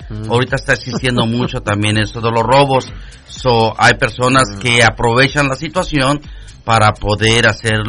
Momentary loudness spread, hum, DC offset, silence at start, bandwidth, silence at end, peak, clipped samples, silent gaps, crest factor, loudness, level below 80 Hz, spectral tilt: 7 LU; none; under 0.1%; 0 s; 11 kHz; 0 s; 0 dBFS; under 0.1%; none; 14 dB; -13 LUFS; -32 dBFS; -4.5 dB/octave